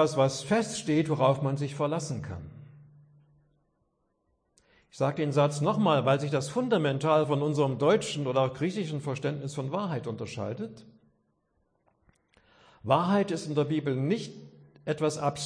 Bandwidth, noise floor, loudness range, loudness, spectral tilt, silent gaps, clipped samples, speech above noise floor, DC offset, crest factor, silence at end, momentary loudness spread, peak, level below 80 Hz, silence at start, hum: 10.5 kHz; -75 dBFS; 11 LU; -28 LUFS; -6 dB/octave; none; under 0.1%; 47 dB; under 0.1%; 20 dB; 0 s; 11 LU; -8 dBFS; -68 dBFS; 0 s; none